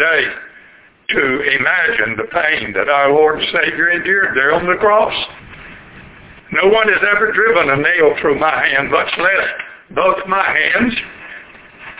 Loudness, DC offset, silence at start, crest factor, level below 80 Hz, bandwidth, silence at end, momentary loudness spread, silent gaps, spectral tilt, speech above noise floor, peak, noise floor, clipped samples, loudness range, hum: -13 LUFS; under 0.1%; 0 s; 14 dB; -48 dBFS; 4 kHz; 0.05 s; 12 LU; none; -7.5 dB/octave; 31 dB; 0 dBFS; -45 dBFS; under 0.1%; 2 LU; none